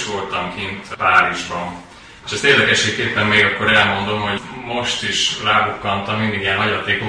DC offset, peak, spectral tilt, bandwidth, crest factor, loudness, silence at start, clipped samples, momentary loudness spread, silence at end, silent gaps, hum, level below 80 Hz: under 0.1%; 0 dBFS; -3 dB/octave; 10.5 kHz; 18 dB; -16 LUFS; 0 s; under 0.1%; 12 LU; 0 s; none; none; -48 dBFS